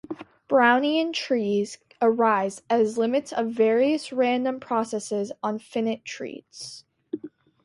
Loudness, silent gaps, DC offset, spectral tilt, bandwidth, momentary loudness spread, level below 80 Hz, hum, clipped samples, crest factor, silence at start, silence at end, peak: -24 LUFS; none; under 0.1%; -4.5 dB/octave; 11.5 kHz; 17 LU; -72 dBFS; none; under 0.1%; 18 dB; 0.1 s; 0.35 s; -6 dBFS